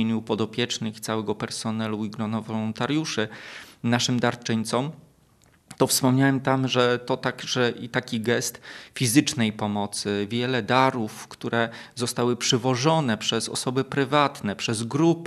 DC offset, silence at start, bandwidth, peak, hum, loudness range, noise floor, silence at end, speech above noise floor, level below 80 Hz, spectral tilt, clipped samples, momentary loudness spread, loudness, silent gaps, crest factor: under 0.1%; 0 s; 14 kHz; -4 dBFS; none; 4 LU; -59 dBFS; 0 s; 34 dB; -68 dBFS; -4.5 dB/octave; under 0.1%; 9 LU; -25 LUFS; none; 22 dB